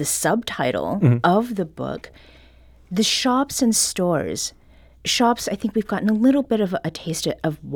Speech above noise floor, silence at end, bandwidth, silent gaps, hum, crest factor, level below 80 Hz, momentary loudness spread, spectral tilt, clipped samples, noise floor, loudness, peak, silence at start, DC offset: 28 dB; 0 s; 19.5 kHz; none; none; 18 dB; -52 dBFS; 10 LU; -4 dB/octave; under 0.1%; -49 dBFS; -21 LUFS; -4 dBFS; 0 s; under 0.1%